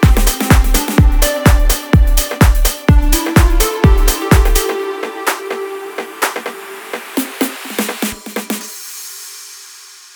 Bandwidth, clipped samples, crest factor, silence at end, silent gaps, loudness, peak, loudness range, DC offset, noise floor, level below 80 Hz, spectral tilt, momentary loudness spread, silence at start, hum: over 20 kHz; under 0.1%; 12 dB; 0.4 s; none; -14 LUFS; 0 dBFS; 9 LU; under 0.1%; -37 dBFS; -16 dBFS; -4.5 dB/octave; 14 LU; 0 s; none